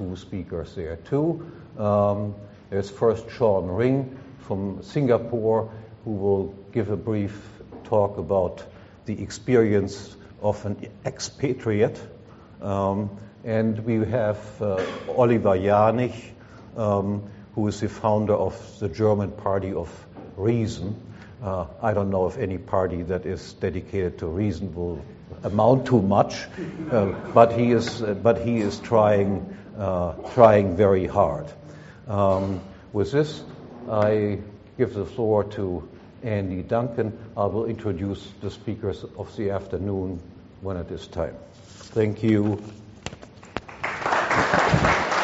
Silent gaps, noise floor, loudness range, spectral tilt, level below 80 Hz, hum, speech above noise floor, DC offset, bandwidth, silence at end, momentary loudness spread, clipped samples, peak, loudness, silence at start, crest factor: none; -43 dBFS; 7 LU; -6.5 dB/octave; -48 dBFS; none; 19 dB; under 0.1%; 8 kHz; 0 s; 17 LU; under 0.1%; 0 dBFS; -24 LUFS; 0 s; 24 dB